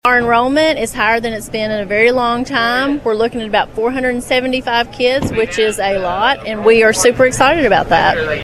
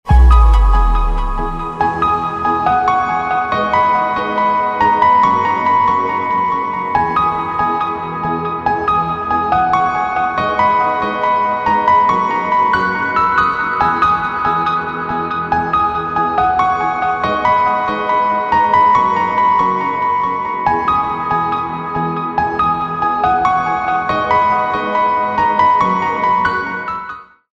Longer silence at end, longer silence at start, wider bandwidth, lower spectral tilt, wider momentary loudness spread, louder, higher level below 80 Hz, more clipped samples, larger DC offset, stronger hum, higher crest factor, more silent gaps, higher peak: second, 0 s vs 0.3 s; about the same, 0.05 s vs 0.05 s; first, 14 kHz vs 7.2 kHz; second, -3.5 dB/octave vs -6.5 dB/octave; about the same, 6 LU vs 7 LU; about the same, -13 LUFS vs -15 LUFS; second, -38 dBFS vs -22 dBFS; neither; neither; neither; about the same, 14 dB vs 14 dB; neither; about the same, 0 dBFS vs 0 dBFS